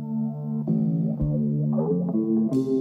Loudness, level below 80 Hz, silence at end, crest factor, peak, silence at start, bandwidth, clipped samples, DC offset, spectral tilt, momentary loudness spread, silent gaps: -25 LUFS; -46 dBFS; 0 s; 12 dB; -12 dBFS; 0 s; 5.4 kHz; under 0.1%; under 0.1%; -11.5 dB/octave; 6 LU; none